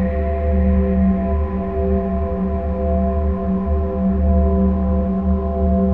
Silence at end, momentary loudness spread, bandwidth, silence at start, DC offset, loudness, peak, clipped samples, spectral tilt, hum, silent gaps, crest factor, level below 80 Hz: 0 s; 5 LU; 3 kHz; 0 s; 2%; -19 LUFS; -6 dBFS; under 0.1%; -12.5 dB/octave; none; none; 12 dB; -22 dBFS